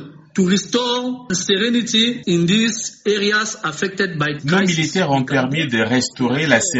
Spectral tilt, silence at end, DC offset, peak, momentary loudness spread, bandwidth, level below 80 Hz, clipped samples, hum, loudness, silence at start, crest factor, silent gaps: -4 dB/octave; 0 s; under 0.1%; 0 dBFS; 7 LU; 8.2 kHz; -56 dBFS; under 0.1%; none; -18 LUFS; 0 s; 18 dB; none